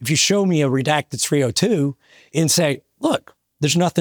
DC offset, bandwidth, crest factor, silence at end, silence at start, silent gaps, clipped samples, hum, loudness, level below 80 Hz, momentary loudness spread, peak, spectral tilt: under 0.1%; over 20 kHz; 18 dB; 0 s; 0 s; none; under 0.1%; none; -19 LUFS; -62 dBFS; 8 LU; -2 dBFS; -4 dB/octave